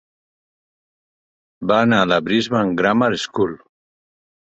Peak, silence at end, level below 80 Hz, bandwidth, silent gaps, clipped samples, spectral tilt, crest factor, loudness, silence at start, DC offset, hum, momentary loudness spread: -2 dBFS; 0.95 s; -56 dBFS; 8 kHz; none; under 0.1%; -5.5 dB/octave; 18 dB; -18 LUFS; 1.6 s; under 0.1%; none; 7 LU